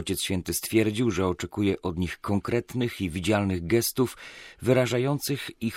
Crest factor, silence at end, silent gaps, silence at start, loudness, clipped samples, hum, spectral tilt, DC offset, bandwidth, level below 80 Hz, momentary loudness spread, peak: 18 dB; 0 s; none; 0 s; -27 LUFS; under 0.1%; none; -5 dB/octave; under 0.1%; 16.5 kHz; -54 dBFS; 7 LU; -8 dBFS